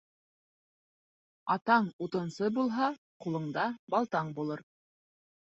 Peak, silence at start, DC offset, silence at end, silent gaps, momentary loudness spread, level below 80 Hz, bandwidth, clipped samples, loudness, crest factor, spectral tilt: -12 dBFS; 1.45 s; under 0.1%; 0.8 s; 1.93-1.99 s, 2.98-3.20 s, 3.79-3.87 s; 11 LU; -78 dBFS; 8 kHz; under 0.1%; -32 LUFS; 22 dB; -7 dB/octave